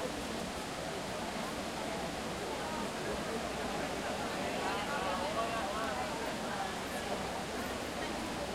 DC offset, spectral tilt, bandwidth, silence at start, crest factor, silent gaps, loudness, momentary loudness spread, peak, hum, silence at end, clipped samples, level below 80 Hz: under 0.1%; -3.5 dB/octave; 16.5 kHz; 0 s; 16 dB; none; -37 LUFS; 4 LU; -22 dBFS; none; 0 s; under 0.1%; -56 dBFS